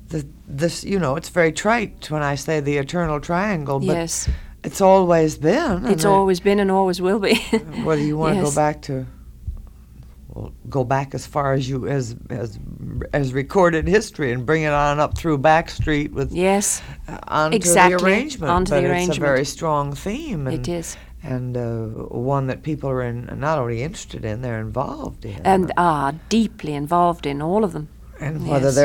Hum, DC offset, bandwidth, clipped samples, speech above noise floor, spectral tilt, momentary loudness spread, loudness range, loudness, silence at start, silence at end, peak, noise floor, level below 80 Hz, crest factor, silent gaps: none; under 0.1%; 17.5 kHz; under 0.1%; 22 dB; -5 dB/octave; 13 LU; 7 LU; -20 LUFS; 0 s; 0 s; 0 dBFS; -42 dBFS; -38 dBFS; 20 dB; none